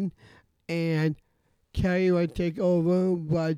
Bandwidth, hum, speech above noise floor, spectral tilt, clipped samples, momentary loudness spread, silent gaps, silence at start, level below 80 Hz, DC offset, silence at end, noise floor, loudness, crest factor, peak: 10.5 kHz; none; 36 dB; -8.5 dB/octave; under 0.1%; 12 LU; none; 0 s; -46 dBFS; under 0.1%; 0 s; -61 dBFS; -26 LUFS; 12 dB; -14 dBFS